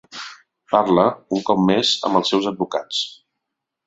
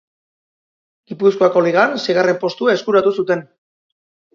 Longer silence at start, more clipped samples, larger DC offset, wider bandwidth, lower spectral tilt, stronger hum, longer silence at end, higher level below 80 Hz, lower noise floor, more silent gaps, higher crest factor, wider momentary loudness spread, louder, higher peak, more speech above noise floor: second, 0.1 s vs 1.1 s; neither; neither; first, 8 kHz vs 7.2 kHz; about the same, -5 dB/octave vs -5.5 dB/octave; neither; second, 0.75 s vs 0.9 s; first, -60 dBFS vs -68 dBFS; second, -81 dBFS vs under -90 dBFS; neither; about the same, 20 dB vs 18 dB; first, 13 LU vs 7 LU; second, -19 LUFS vs -16 LUFS; about the same, -2 dBFS vs 0 dBFS; second, 62 dB vs over 75 dB